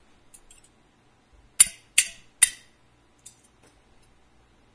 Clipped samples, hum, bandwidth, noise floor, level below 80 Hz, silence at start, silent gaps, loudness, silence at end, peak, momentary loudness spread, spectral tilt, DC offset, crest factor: under 0.1%; none; 11 kHz; -61 dBFS; -60 dBFS; 1.6 s; none; -20 LUFS; 2.25 s; 0 dBFS; 12 LU; 3 dB/octave; under 0.1%; 30 dB